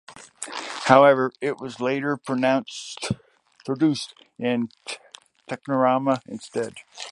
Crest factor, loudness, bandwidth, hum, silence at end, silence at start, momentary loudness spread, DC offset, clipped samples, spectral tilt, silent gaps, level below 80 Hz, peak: 24 dB; -23 LUFS; 11.5 kHz; none; 0 s; 0.1 s; 18 LU; under 0.1%; under 0.1%; -5 dB/octave; none; -64 dBFS; 0 dBFS